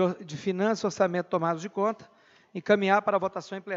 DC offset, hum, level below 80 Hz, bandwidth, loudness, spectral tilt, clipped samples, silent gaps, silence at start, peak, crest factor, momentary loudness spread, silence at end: under 0.1%; none; -76 dBFS; 7.8 kHz; -27 LUFS; -6 dB/octave; under 0.1%; none; 0 s; -8 dBFS; 18 dB; 14 LU; 0 s